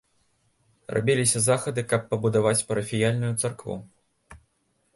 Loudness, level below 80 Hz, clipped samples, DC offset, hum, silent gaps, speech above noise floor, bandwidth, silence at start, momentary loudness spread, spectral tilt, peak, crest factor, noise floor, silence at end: -24 LUFS; -58 dBFS; under 0.1%; under 0.1%; none; none; 46 dB; 12 kHz; 0.9 s; 9 LU; -4.5 dB/octave; -8 dBFS; 18 dB; -70 dBFS; 0.6 s